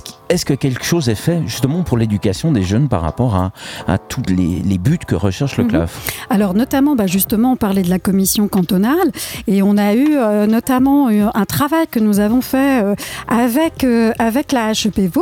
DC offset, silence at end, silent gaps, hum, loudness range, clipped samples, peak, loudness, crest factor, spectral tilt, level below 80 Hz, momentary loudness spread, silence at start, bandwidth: under 0.1%; 0 s; none; none; 3 LU; under 0.1%; 0 dBFS; -15 LUFS; 14 dB; -6 dB/octave; -38 dBFS; 5 LU; 0.05 s; 18 kHz